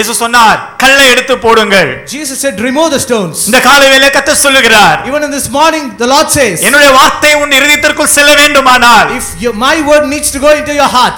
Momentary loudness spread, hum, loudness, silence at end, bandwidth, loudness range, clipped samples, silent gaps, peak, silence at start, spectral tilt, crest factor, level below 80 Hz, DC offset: 9 LU; none; -5 LUFS; 0 s; over 20 kHz; 2 LU; 2%; none; 0 dBFS; 0 s; -1.5 dB/octave; 6 dB; -34 dBFS; under 0.1%